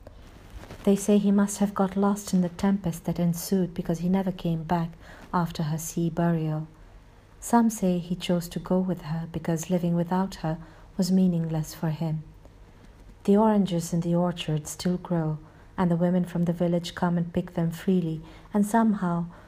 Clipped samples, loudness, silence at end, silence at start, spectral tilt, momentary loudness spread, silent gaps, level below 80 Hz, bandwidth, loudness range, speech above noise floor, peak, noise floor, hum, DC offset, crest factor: under 0.1%; -26 LUFS; 0 s; 0 s; -6.5 dB/octave; 9 LU; none; -50 dBFS; 15.5 kHz; 3 LU; 25 dB; -8 dBFS; -51 dBFS; none; under 0.1%; 18 dB